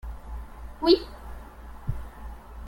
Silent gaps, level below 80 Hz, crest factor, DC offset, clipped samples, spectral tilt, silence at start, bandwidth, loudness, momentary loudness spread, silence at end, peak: none; -40 dBFS; 22 dB; under 0.1%; under 0.1%; -7 dB/octave; 0.05 s; 16.5 kHz; -26 LUFS; 22 LU; 0 s; -8 dBFS